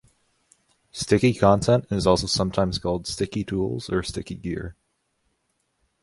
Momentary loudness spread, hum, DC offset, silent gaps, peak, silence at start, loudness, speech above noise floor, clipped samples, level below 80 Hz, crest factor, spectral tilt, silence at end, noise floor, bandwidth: 14 LU; none; under 0.1%; none; -2 dBFS; 0.95 s; -23 LUFS; 50 dB; under 0.1%; -44 dBFS; 22 dB; -5.5 dB/octave; 1.3 s; -73 dBFS; 11.5 kHz